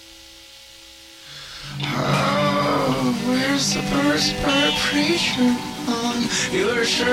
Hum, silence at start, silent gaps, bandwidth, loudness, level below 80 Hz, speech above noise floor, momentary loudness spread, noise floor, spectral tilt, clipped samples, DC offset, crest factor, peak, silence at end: none; 0 s; none; 16.5 kHz; -20 LUFS; -46 dBFS; 24 dB; 11 LU; -44 dBFS; -3.5 dB/octave; under 0.1%; under 0.1%; 16 dB; -6 dBFS; 0 s